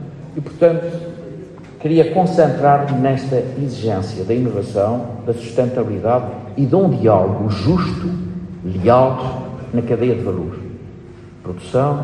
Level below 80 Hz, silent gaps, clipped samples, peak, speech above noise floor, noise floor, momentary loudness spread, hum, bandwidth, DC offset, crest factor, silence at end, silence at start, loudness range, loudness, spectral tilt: -46 dBFS; none; under 0.1%; 0 dBFS; 21 dB; -37 dBFS; 17 LU; none; 10 kHz; under 0.1%; 16 dB; 0 s; 0 s; 3 LU; -17 LUFS; -8.5 dB/octave